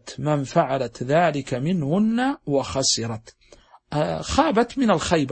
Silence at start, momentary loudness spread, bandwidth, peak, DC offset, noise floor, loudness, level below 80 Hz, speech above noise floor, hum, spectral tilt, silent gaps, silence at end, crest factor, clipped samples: 0.05 s; 6 LU; 8.8 kHz; -2 dBFS; under 0.1%; -52 dBFS; -22 LUFS; -46 dBFS; 30 dB; none; -5 dB/octave; none; 0 s; 20 dB; under 0.1%